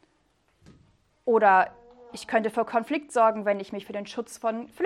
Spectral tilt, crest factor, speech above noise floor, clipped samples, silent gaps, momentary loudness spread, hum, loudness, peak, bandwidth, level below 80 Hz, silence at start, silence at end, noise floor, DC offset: -4.5 dB/octave; 20 dB; 43 dB; under 0.1%; none; 15 LU; none; -25 LUFS; -8 dBFS; 13.5 kHz; -70 dBFS; 1.25 s; 0 s; -68 dBFS; under 0.1%